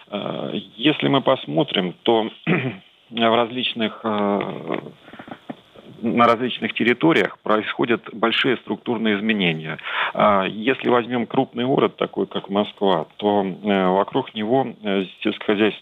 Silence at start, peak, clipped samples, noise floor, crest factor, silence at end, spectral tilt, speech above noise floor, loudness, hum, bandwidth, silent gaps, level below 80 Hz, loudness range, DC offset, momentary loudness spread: 0.1 s; -2 dBFS; under 0.1%; -44 dBFS; 18 dB; 0 s; -7.5 dB/octave; 23 dB; -21 LUFS; none; 8.2 kHz; none; -70 dBFS; 3 LU; under 0.1%; 11 LU